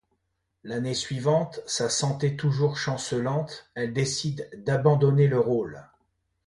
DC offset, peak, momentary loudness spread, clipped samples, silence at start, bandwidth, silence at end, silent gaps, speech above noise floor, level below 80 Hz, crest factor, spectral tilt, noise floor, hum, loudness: under 0.1%; -8 dBFS; 11 LU; under 0.1%; 0.65 s; 11.5 kHz; 0.65 s; none; 51 dB; -60 dBFS; 18 dB; -5.5 dB/octave; -76 dBFS; none; -26 LUFS